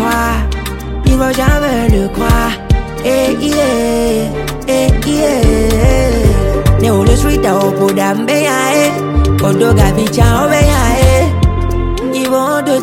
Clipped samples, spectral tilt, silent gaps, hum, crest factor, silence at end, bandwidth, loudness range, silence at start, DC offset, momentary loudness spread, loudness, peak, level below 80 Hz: under 0.1%; -5.5 dB/octave; none; none; 10 dB; 0 s; 17 kHz; 3 LU; 0 s; under 0.1%; 6 LU; -12 LUFS; 0 dBFS; -16 dBFS